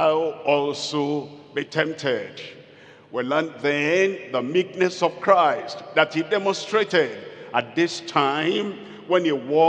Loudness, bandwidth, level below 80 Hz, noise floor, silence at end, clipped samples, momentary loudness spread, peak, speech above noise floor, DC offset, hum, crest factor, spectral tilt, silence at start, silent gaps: -23 LUFS; 9.6 kHz; -80 dBFS; -48 dBFS; 0 s; under 0.1%; 10 LU; -2 dBFS; 26 dB; under 0.1%; none; 20 dB; -4.5 dB/octave; 0 s; none